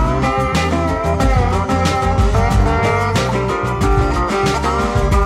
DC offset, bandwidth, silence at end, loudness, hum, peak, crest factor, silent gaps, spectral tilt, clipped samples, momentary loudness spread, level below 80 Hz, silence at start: under 0.1%; 14 kHz; 0 s; -16 LUFS; none; -2 dBFS; 12 dB; none; -6 dB/octave; under 0.1%; 2 LU; -20 dBFS; 0 s